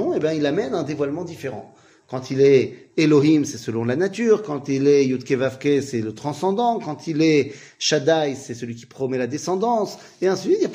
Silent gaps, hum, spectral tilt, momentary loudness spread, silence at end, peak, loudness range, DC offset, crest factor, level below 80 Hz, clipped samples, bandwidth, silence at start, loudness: none; none; -5.5 dB/octave; 14 LU; 0 s; -4 dBFS; 3 LU; under 0.1%; 16 dB; -66 dBFS; under 0.1%; 15 kHz; 0 s; -21 LUFS